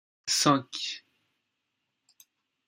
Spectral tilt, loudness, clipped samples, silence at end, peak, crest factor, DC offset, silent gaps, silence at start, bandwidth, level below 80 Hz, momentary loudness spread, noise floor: -3 dB/octave; -27 LUFS; under 0.1%; 1.7 s; -8 dBFS; 24 dB; under 0.1%; none; 0.25 s; 16 kHz; -72 dBFS; 13 LU; -82 dBFS